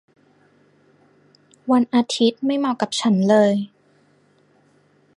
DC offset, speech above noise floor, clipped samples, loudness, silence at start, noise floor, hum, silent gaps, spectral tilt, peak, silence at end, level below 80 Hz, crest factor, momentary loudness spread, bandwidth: under 0.1%; 40 dB; under 0.1%; -19 LUFS; 1.65 s; -58 dBFS; 50 Hz at -40 dBFS; none; -5.5 dB/octave; -4 dBFS; 1.5 s; -72 dBFS; 18 dB; 9 LU; 11 kHz